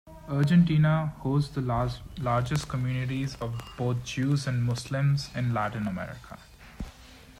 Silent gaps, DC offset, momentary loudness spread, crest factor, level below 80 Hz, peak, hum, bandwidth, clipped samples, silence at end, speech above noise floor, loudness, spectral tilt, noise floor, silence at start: none; under 0.1%; 18 LU; 16 dB; -48 dBFS; -12 dBFS; none; 13.5 kHz; under 0.1%; 0.1 s; 23 dB; -28 LUFS; -7 dB/octave; -50 dBFS; 0.05 s